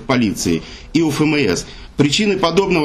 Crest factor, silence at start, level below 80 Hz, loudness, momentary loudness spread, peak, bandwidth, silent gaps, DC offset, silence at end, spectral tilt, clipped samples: 14 dB; 0 s; -40 dBFS; -17 LUFS; 7 LU; -4 dBFS; 13.5 kHz; none; under 0.1%; 0 s; -4.5 dB/octave; under 0.1%